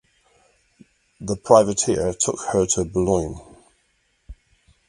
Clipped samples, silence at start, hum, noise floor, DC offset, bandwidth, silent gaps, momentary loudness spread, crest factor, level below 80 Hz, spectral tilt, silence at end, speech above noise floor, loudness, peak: under 0.1%; 1.2 s; none; -66 dBFS; under 0.1%; 11.5 kHz; none; 16 LU; 24 dB; -44 dBFS; -4.5 dB/octave; 0.55 s; 47 dB; -20 LUFS; 0 dBFS